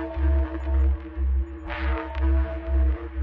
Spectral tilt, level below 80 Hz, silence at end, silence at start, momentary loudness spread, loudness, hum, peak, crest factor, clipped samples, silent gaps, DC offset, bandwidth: -10 dB/octave; -24 dBFS; 0 s; 0 s; 4 LU; -26 LUFS; none; -14 dBFS; 10 dB; under 0.1%; none; under 0.1%; 4.2 kHz